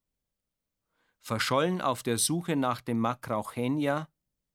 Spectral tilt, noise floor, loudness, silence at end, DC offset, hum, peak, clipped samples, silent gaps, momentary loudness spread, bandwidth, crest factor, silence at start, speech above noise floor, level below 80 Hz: -4.5 dB/octave; -87 dBFS; -29 LUFS; 0.5 s; under 0.1%; none; -12 dBFS; under 0.1%; none; 7 LU; 17.5 kHz; 18 dB; 1.25 s; 58 dB; -70 dBFS